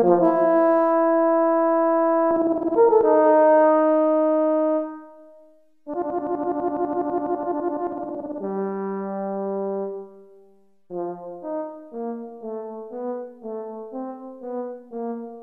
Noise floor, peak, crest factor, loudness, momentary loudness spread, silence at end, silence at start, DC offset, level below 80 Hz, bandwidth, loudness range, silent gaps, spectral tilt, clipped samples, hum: -57 dBFS; -6 dBFS; 16 dB; -22 LUFS; 17 LU; 0 s; 0 s; under 0.1%; -66 dBFS; 3.3 kHz; 15 LU; none; -10.5 dB/octave; under 0.1%; none